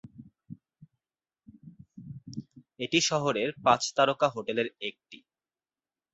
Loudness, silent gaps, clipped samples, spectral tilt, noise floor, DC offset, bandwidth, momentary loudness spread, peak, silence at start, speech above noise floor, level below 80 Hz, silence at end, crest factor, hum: -27 LUFS; none; under 0.1%; -3.5 dB/octave; under -90 dBFS; under 0.1%; 8.2 kHz; 21 LU; -8 dBFS; 0.05 s; over 62 dB; -70 dBFS; 0.95 s; 24 dB; none